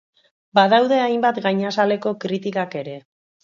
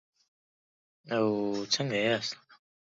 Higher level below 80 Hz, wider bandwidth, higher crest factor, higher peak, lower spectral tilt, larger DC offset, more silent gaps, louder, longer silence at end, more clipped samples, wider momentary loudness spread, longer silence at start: about the same, -72 dBFS vs -76 dBFS; about the same, 7.4 kHz vs 8 kHz; about the same, 20 dB vs 20 dB; first, 0 dBFS vs -12 dBFS; first, -6 dB/octave vs -4 dB/octave; neither; neither; first, -19 LUFS vs -30 LUFS; about the same, 0.45 s vs 0.5 s; neither; first, 14 LU vs 8 LU; second, 0.55 s vs 1.05 s